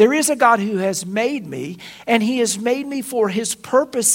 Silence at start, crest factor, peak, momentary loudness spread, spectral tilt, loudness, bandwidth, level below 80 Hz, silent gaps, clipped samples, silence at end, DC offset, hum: 0 s; 18 dB; 0 dBFS; 12 LU; -3 dB/octave; -19 LUFS; 16.5 kHz; -64 dBFS; none; under 0.1%; 0 s; under 0.1%; none